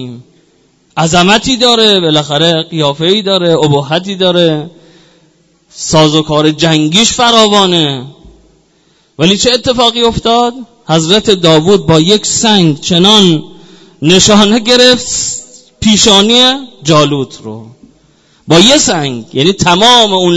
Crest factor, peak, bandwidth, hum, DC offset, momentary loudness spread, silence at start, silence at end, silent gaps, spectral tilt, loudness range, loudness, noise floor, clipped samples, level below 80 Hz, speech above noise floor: 10 dB; 0 dBFS; 11 kHz; none; under 0.1%; 11 LU; 0 s; 0 s; none; -3.5 dB/octave; 4 LU; -7 LUFS; -51 dBFS; 2%; -38 dBFS; 42 dB